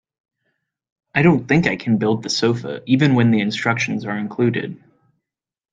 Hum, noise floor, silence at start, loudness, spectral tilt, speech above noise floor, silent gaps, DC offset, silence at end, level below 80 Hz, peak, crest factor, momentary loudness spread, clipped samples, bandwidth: none; -88 dBFS; 1.15 s; -18 LUFS; -6 dB/octave; 70 dB; none; under 0.1%; 0.95 s; -54 dBFS; -2 dBFS; 18 dB; 10 LU; under 0.1%; 9 kHz